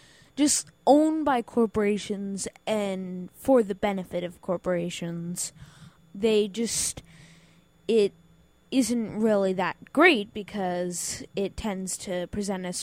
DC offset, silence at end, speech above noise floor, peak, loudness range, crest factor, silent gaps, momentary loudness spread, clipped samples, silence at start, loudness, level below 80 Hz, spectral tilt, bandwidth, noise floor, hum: under 0.1%; 0 s; 33 dB; -6 dBFS; 4 LU; 22 dB; none; 12 LU; under 0.1%; 0.35 s; -26 LUFS; -56 dBFS; -4 dB/octave; 16 kHz; -59 dBFS; none